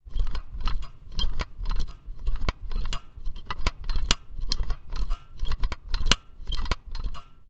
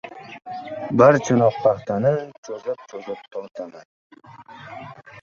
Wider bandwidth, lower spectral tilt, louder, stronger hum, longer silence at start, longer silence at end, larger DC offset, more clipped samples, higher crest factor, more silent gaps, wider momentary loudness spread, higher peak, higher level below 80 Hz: first, 8.2 kHz vs 7.4 kHz; second, -3 dB/octave vs -7 dB/octave; second, -33 LUFS vs -20 LUFS; neither; about the same, 0.05 s vs 0.05 s; about the same, 0.05 s vs 0 s; neither; neither; first, 26 dB vs 20 dB; second, none vs 2.38-2.43 s, 3.85-4.10 s; second, 12 LU vs 23 LU; about the same, 0 dBFS vs -2 dBFS; first, -28 dBFS vs -60 dBFS